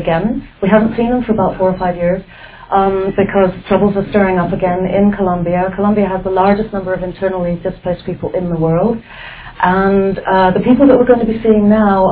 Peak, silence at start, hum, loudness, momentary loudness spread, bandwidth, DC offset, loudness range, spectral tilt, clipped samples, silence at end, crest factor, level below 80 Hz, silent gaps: 0 dBFS; 0 s; none; -13 LUFS; 10 LU; 4 kHz; under 0.1%; 4 LU; -11.5 dB/octave; under 0.1%; 0 s; 12 dB; -36 dBFS; none